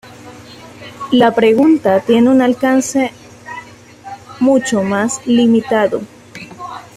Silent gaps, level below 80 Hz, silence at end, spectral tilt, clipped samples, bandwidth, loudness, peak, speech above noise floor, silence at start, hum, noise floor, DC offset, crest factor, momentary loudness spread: none; -54 dBFS; 0.15 s; -5 dB/octave; under 0.1%; 13.5 kHz; -13 LUFS; -2 dBFS; 24 dB; 0.05 s; none; -36 dBFS; under 0.1%; 14 dB; 22 LU